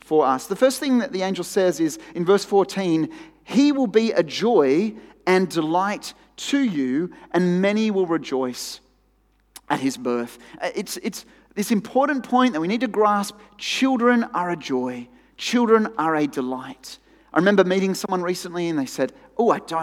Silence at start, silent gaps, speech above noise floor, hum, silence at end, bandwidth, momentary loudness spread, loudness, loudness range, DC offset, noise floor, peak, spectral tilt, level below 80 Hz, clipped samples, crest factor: 0.1 s; none; 41 dB; none; 0 s; 16.5 kHz; 12 LU; -22 LUFS; 5 LU; under 0.1%; -62 dBFS; -2 dBFS; -5 dB/octave; -64 dBFS; under 0.1%; 20 dB